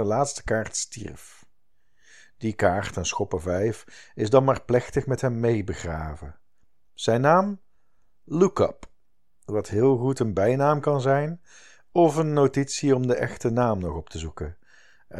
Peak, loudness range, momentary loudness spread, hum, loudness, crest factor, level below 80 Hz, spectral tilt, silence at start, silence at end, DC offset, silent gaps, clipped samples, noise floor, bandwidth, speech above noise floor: -4 dBFS; 5 LU; 14 LU; none; -24 LUFS; 22 dB; -48 dBFS; -6 dB/octave; 0 s; 0 s; 0.4%; none; under 0.1%; -73 dBFS; 12.5 kHz; 49 dB